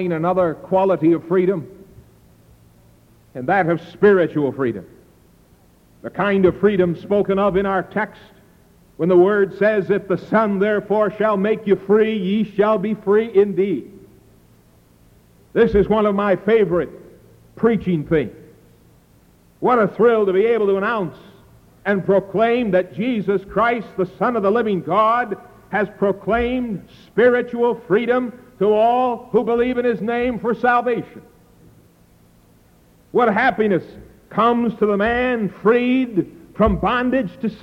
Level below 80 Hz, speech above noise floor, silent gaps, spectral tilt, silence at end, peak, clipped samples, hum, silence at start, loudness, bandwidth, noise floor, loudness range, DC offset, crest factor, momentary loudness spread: -44 dBFS; 35 dB; none; -8.5 dB/octave; 0.05 s; -4 dBFS; under 0.1%; none; 0 s; -18 LUFS; 6 kHz; -52 dBFS; 3 LU; under 0.1%; 16 dB; 9 LU